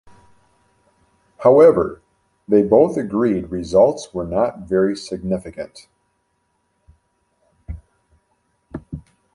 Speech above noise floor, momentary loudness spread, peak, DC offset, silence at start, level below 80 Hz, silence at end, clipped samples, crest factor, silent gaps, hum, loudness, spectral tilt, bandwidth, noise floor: 52 dB; 24 LU; -2 dBFS; under 0.1%; 1.4 s; -46 dBFS; 0.35 s; under 0.1%; 18 dB; none; none; -17 LUFS; -7 dB/octave; 11 kHz; -68 dBFS